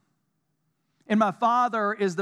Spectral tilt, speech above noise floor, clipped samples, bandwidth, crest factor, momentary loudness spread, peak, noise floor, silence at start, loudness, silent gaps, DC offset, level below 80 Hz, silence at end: -6 dB/octave; 52 dB; under 0.1%; 10.5 kHz; 18 dB; 4 LU; -8 dBFS; -75 dBFS; 1.1 s; -24 LUFS; none; under 0.1%; -88 dBFS; 0 s